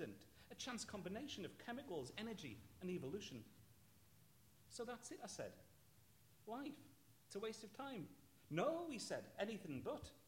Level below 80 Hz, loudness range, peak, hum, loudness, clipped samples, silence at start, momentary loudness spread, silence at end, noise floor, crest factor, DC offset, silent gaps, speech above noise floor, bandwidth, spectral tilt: -78 dBFS; 7 LU; -30 dBFS; none; -50 LUFS; under 0.1%; 0 s; 16 LU; 0 s; -72 dBFS; 22 dB; under 0.1%; none; 22 dB; 16.5 kHz; -4.5 dB/octave